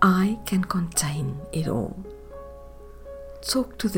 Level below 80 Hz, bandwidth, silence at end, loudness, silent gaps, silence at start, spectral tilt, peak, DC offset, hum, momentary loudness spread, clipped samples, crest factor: -44 dBFS; 17 kHz; 0 s; -26 LUFS; none; 0 s; -5 dB/octave; -4 dBFS; under 0.1%; none; 19 LU; under 0.1%; 22 dB